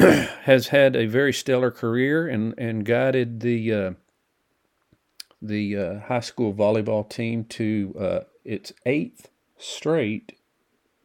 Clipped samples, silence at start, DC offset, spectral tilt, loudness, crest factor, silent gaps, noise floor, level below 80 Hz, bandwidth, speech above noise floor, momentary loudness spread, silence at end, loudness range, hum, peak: under 0.1%; 0 s; under 0.1%; -6 dB/octave; -23 LUFS; 22 dB; none; -71 dBFS; -60 dBFS; 17 kHz; 49 dB; 15 LU; 0.85 s; 7 LU; none; 0 dBFS